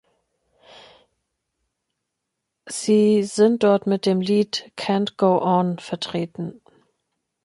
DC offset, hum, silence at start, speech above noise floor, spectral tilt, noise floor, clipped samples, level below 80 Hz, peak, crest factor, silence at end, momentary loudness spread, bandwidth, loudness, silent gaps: under 0.1%; none; 2.65 s; 60 dB; -6 dB/octave; -80 dBFS; under 0.1%; -68 dBFS; -4 dBFS; 18 dB; 0.95 s; 11 LU; 11.5 kHz; -20 LUFS; none